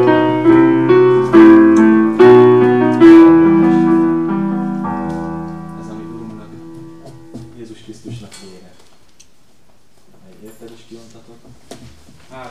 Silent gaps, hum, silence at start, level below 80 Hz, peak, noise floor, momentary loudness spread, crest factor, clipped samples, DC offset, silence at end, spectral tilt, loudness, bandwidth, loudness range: none; none; 0 s; -50 dBFS; 0 dBFS; -53 dBFS; 24 LU; 12 dB; 0.4%; 0.9%; 0 s; -8 dB/octave; -9 LUFS; 7.6 kHz; 23 LU